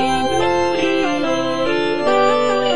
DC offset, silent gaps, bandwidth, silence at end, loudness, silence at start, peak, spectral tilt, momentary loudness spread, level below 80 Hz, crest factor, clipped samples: 3%; none; 10 kHz; 0 s; -17 LUFS; 0 s; -4 dBFS; -4.5 dB/octave; 4 LU; -46 dBFS; 14 dB; under 0.1%